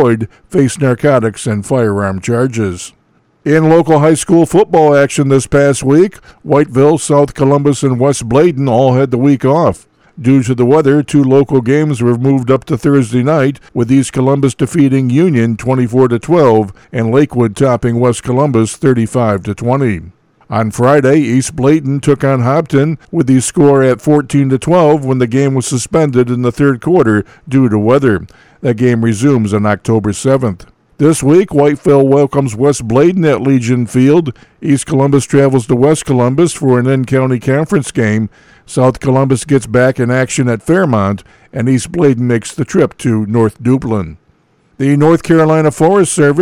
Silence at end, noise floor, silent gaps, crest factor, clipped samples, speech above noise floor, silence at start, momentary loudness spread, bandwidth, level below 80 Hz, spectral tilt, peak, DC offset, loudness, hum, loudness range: 0 s; -53 dBFS; none; 10 dB; under 0.1%; 42 dB; 0 s; 6 LU; 13.5 kHz; -42 dBFS; -7 dB/octave; 0 dBFS; under 0.1%; -11 LUFS; none; 3 LU